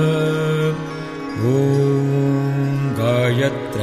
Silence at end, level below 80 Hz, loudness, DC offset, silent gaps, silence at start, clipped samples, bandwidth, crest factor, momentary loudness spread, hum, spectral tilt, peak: 0 s; -52 dBFS; -19 LUFS; under 0.1%; none; 0 s; under 0.1%; 14 kHz; 14 dB; 8 LU; none; -7.5 dB/octave; -4 dBFS